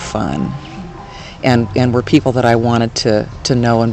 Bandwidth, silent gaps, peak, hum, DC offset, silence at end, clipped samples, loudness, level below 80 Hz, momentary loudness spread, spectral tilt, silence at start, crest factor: 8.8 kHz; none; 0 dBFS; none; under 0.1%; 0 s; 0.3%; -14 LUFS; -38 dBFS; 18 LU; -6 dB/octave; 0 s; 14 dB